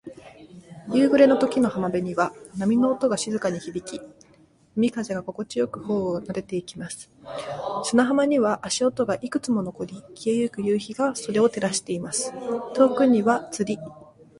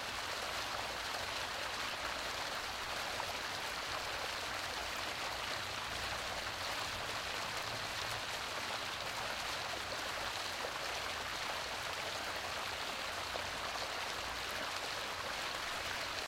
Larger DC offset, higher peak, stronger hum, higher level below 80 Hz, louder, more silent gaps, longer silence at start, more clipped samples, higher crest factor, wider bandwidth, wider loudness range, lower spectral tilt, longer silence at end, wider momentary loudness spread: neither; first, -4 dBFS vs -24 dBFS; neither; about the same, -62 dBFS vs -60 dBFS; first, -24 LUFS vs -39 LUFS; neither; about the same, 0.05 s vs 0 s; neither; about the same, 20 dB vs 16 dB; second, 11.5 kHz vs 16.5 kHz; first, 6 LU vs 0 LU; first, -5 dB/octave vs -1.5 dB/octave; first, 0.4 s vs 0 s; first, 15 LU vs 1 LU